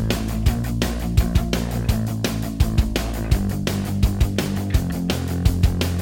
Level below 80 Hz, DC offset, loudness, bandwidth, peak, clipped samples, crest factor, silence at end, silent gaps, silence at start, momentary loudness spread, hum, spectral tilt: -24 dBFS; under 0.1%; -22 LUFS; 17 kHz; -4 dBFS; under 0.1%; 16 dB; 0 s; none; 0 s; 3 LU; none; -6 dB/octave